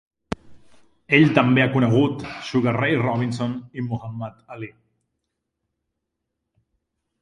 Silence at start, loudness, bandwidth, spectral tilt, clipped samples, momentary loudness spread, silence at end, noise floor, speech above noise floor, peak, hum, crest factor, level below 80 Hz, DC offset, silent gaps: 0.45 s; -20 LUFS; 10.5 kHz; -7.5 dB/octave; under 0.1%; 19 LU; 2.55 s; -80 dBFS; 60 dB; 0 dBFS; none; 24 dB; -54 dBFS; under 0.1%; none